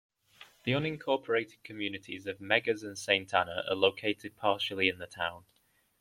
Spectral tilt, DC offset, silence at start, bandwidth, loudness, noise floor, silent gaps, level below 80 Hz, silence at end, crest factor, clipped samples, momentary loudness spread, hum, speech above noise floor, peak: -4.5 dB/octave; under 0.1%; 0.4 s; 16 kHz; -32 LUFS; -58 dBFS; none; -72 dBFS; 0.6 s; 24 dB; under 0.1%; 10 LU; none; 26 dB; -8 dBFS